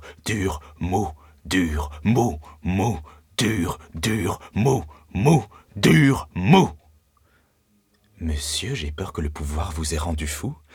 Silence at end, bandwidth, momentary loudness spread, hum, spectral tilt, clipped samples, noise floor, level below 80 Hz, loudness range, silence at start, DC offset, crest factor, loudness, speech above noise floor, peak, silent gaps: 0.2 s; 18.5 kHz; 13 LU; none; -5.5 dB/octave; under 0.1%; -64 dBFS; -38 dBFS; 8 LU; 0 s; under 0.1%; 20 dB; -23 LUFS; 42 dB; -2 dBFS; none